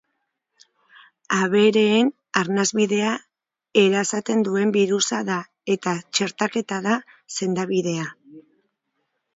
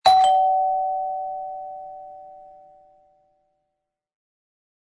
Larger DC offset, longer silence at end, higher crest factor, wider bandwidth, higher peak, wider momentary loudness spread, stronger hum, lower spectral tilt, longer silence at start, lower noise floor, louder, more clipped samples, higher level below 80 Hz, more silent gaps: neither; second, 0.95 s vs 2.5 s; about the same, 22 dB vs 20 dB; second, 7.8 kHz vs 11 kHz; about the same, -2 dBFS vs -4 dBFS; second, 10 LU vs 25 LU; neither; first, -4 dB/octave vs -1 dB/octave; first, 1.3 s vs 0.05 s; second, -76 dBFS vs -80 dBFS; about the same, -21 LUFS vs -21 LUFS; neither; second, -70 dBFS vs -64 dBFS; neither